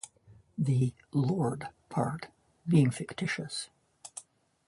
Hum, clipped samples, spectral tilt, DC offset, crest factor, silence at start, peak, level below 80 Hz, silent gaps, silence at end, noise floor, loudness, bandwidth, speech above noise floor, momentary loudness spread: none; under 0.1%; -6.5 dB/octave; under 0.1%; 20 dB; 0.05 s; -12 dBFS; -66 dBFS; none; 0.45 s; -60 dBFS; -31 LUFS; 11.5 kHz; 30 dB; 20 LU